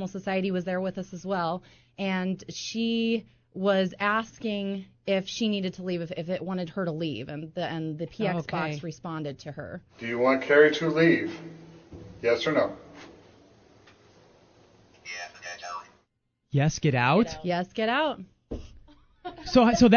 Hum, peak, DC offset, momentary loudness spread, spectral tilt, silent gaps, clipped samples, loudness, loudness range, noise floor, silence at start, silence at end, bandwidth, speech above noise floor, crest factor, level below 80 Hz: none; -4 dBFS; under 0.1%; 19 LU; -5.5 dB/octave; none; under 0.1%; -27 LUFS; 8 LU; -75 dBFS; 0 s; 0 s; 7 kHz; 49 dB; 22 dB; -54 dBFS